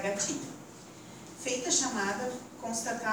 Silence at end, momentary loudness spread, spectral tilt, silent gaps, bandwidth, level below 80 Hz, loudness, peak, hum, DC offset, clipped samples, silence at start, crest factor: 0 s; 20 LU; -2 dB/octave; none; over 20 kHz; -70 dBFS; -32 LUFS; -14 dBFS; none; under 0.1%; under 0.1%; 0 s; 20 dB